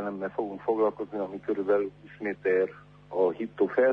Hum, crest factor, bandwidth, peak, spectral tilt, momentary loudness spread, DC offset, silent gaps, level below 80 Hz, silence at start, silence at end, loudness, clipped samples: 50 Hz at -55 dBFS; 16 dB; 5.2 kHz; -12 dBFS; -8.5 dB/octave; 8 LU; under 0.1%; none; -66 dBFS; 0 s; 0 s; -29 LUFS; under 0.1%